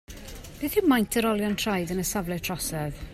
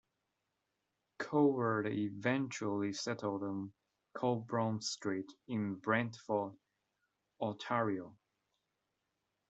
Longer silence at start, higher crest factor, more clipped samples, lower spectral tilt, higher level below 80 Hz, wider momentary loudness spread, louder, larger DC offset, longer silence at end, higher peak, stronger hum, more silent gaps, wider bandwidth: second, 0.1 s vs 1.2 s; about the same, 18 dB vs 22 dB; neither; about the same, -4.5 dB/octave vs -5.5 dB/octave; first, -46 dBFS vs -80 dBFS; first, 14 LU vs 11 LU; first, -26 LUFS vs -37 LUFS; neither; second, 0 s vs 1.35 s; first, -10 dBFS vs -16 dBFS; neither; neither; first, 16 kHz vs 8.2 kHz